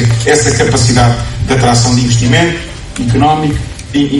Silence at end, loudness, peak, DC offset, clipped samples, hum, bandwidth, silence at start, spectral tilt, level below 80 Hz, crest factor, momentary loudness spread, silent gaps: 0 s; -10 LUFS; 0 dBFS; under 0.1%; 0.2%; none; 11.5 kHz; 0 s; -5 dB/octave; -26 dBFS; 10 dB; 9 LU; none